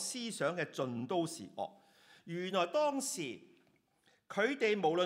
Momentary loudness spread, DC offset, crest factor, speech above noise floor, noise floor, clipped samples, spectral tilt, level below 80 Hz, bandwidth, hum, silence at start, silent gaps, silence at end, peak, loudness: 12 LU; under 0.1%; 18 dB; 38 dB; -73 dBFS; under 0.1%; -3.5 dB/octave; -90 dBFS; 16 kHz; none; 0 s; none; 0 s; -18 dBFS; -36 LUFS